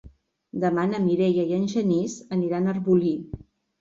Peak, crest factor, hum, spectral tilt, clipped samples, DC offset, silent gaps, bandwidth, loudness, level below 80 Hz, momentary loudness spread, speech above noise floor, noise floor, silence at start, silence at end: -8 dBFS; 16 dB; none; -7.5 dB/octave; under 0.1%; under 0.1%; none; 7.6 kHz; -24 LUFS; -56 dBFS; 10 LU; 26 dB; -49 dBFS; 0.05 s; 0.45 s